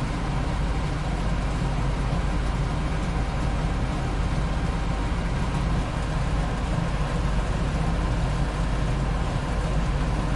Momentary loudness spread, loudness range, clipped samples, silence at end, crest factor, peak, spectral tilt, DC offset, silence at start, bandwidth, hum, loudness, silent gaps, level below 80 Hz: 1 LU; 1 LU; under 0.1%; 0 s; 12 dB; -12 dBFS; -6.5 dB/octave; under 0.1%; 0 s; 11.5 kHz; none; -27 LUFS; none; -28 dBFS